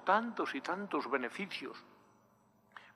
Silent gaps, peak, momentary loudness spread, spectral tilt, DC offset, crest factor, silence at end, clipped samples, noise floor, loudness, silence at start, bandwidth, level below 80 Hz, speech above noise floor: none; -16 dBFS; 22 LU; -5 dB/octave; under 0.1%; 22 dB; 0.05 s; under 0.1%; -69 dBFS; -37 LUFS; 0 s; 14 kHz; under -90 dBFS; 33 dB